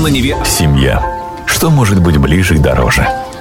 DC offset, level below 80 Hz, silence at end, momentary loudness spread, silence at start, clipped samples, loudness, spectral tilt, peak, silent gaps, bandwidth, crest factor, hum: under 0.1%; -20 dBFS; 0 s; 6 LU; 0 s; under 0.1%; -11 LUFS; -5 dB/octave; -2 dBFS; none; 17 kHz; 8 dB; none